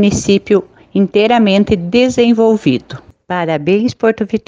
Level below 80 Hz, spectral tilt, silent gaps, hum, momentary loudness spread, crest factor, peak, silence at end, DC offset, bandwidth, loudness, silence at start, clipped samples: -42 dBFS; -5.5 dB/octave; none; none; 10 LU; 12 dB; 0 dBFS; 0.1 s; under 0.1%; 9.6 kHz; -13 LUFS; 0 s; under 0.1%